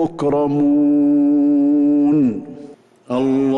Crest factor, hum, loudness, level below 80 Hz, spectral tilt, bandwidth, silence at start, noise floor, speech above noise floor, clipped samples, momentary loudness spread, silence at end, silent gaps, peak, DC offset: 6 dB; none; -16 LUFS; -54 dBFS; -9 dB/octave; 4.3 kHz; 0 s; -40 dBFS; 25 dB; under 0.1%; 7 LU; 0 s; none; -8 dBFS; under 0.1%